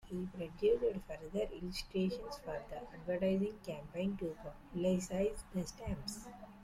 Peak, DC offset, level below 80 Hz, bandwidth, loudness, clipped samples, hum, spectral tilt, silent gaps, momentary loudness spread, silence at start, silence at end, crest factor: -22 dBFS; under 0.1%; -56 dBFS; 15.5 kHz; -39 LUFS; under 0.1%; none; -6 dB/octave; none; 11 LU; 0.05 s; 0 s; 16 dB